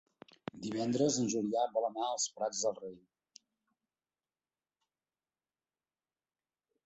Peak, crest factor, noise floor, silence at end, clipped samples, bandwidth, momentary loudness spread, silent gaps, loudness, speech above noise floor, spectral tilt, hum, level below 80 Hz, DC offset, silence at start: -18 dBFS; 20 dB; under -90 dBFS; 3.9 s; under 0.1%; 8.2 kHz; 16 LU; none; -34 LUFS; over 56 dB; -4 dB/octave; none; -78 dBFS; under 0.1%; 0.55 s